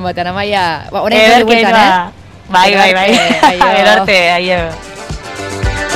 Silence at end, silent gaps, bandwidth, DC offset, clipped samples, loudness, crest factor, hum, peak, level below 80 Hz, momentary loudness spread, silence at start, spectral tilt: 0 s; none; 16.5 kHz; under 0.1%; under 0.1%; -9 LUFS; 10 dB; none; 0 dBFS; -30 dBFS; 15 LU; 0 s; -3.5 dB/octave